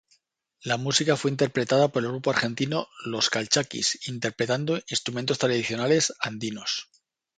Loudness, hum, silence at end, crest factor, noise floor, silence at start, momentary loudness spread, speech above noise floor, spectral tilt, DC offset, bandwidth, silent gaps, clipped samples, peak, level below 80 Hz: -25 LUFS; none; 0.55 s; 20 dB; -68 dBFS; 0.65 s; 8 LU; 42 dB; -3.5 dB/octave; under 0.1%; 9.6 kHz; none; under 0.1%; -6 dBFS; -66 dBFS